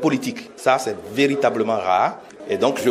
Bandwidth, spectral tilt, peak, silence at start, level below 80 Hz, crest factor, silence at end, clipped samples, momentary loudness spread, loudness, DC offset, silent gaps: 15.5 kHz; -4.5 dB/octave; -2 dBFS; 0 s; -64 dBFS; 18 dB; 0 s; under 0.1%; 8 LU; -21 LUFS; under 0.1%; none